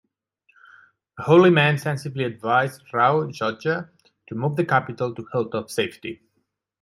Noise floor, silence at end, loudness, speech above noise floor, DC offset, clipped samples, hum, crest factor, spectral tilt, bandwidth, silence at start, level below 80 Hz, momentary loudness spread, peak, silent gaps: -74 dBFS; 0.65 s; -22 LUFS; 52 dB; under 0.1%; under 0.1%; none; 20 dB; -6.5 dB/octave; 13 kHz; 1.15 s; -66 dBFS; 13 LU; -4 dBFS; none